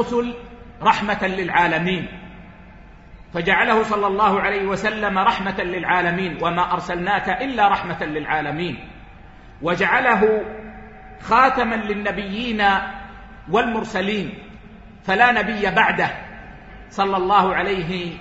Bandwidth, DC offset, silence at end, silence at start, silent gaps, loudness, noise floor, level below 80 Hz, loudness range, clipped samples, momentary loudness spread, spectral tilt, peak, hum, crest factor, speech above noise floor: 8 kHz; under 0.1%; 0 s; 0 s; none; -19 LUFS; -43 dBFS; -44 dBFS; 3 LU; under 0.1%; 18 LU; -5.5 dB/octave; 0 dBFS; none; 20 dB; 23 dB